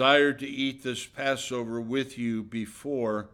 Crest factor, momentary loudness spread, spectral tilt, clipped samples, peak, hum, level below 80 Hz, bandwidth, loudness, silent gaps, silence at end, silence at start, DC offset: 20 dB; 10 LU; -4 dB/octave; under 0.1%; -8 dBFS; none; -66 dBFS; 15.5 kHz; -29 LUFS; none; 0.05 s; 0 s; under 0.1%